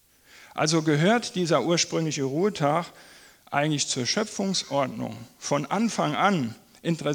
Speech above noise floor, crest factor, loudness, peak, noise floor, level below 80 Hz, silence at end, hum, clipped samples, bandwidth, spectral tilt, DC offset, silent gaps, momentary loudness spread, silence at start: 28 dB; 20 dB; -25 LUFS; -6 dBFS; -53 dBFS; -68 dBFS; 0 s; none; under 0.1%; 19.5 kHz; -4.5 dB/octave; under 0.1%; none; 11 LU; 0.4 s